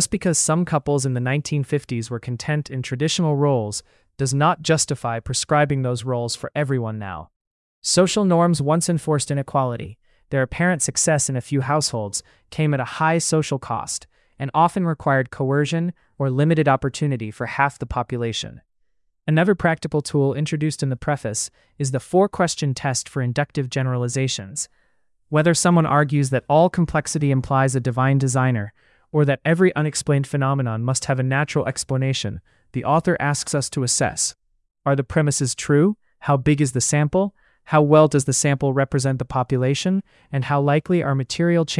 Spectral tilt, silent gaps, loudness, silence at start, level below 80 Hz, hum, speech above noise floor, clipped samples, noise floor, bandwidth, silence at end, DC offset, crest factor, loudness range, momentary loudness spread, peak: -5 dB/octave; 7.36-7.82 s; -21 LUFS; 0 s; -50 dBFS; none; 50 dB; under 0.1%; -70 dBFS; 12 kHz; 0 s; under 0.1%; 18 dB; 4 LU; 10 LU; -2 dBFS